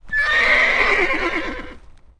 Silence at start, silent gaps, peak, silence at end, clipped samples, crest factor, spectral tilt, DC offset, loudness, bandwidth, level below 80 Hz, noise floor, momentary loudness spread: 0.05 s; none; -4 dBFS; 0.4 s; under 0.1%; 14 dB; -3 dB/octave; under 0.1%; -16 LUFS; 10.5 kHz; -36 dBFS; -40 dBFS; 14 LU